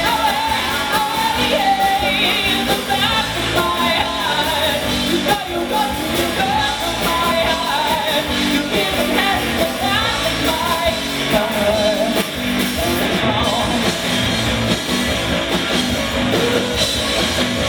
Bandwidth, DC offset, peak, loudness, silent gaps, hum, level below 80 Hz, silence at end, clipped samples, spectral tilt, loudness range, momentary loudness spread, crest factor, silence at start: over 20 kHz; under 0.1%; -2 dBFS; -17 LUFS; none; none; -34 dBFS; 0 s; under 0.1%; -3.5 dB/octave; 1 LU; 3 LU; 16 dB; 0 s